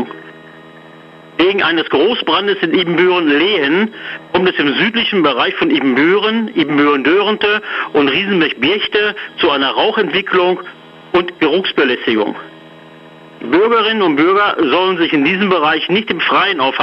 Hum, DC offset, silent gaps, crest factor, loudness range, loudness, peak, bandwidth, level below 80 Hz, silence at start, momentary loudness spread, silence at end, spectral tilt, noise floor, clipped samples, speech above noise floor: none; under 0.1%; none; 12 dB; 3 LU; -13 LUFS; -2 dBFS; 6 kHz; -54 dBFS; 0 s; 5 LU; 0 s; -6.5 dB/octave; -38 dBFS; under 0.1%; 25 dB